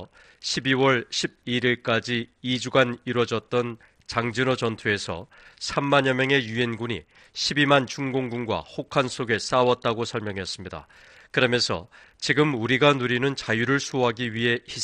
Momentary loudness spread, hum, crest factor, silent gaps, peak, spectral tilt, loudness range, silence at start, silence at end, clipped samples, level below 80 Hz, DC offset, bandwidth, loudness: 11 LU; none; 20 dB; none; -4 dBFS; -4.5 dB/octave; 3 LU; 0 s; 0 s; under 0.1%; -58 dBFS; under 0.1%; 10.5 kHz; -24 LUFS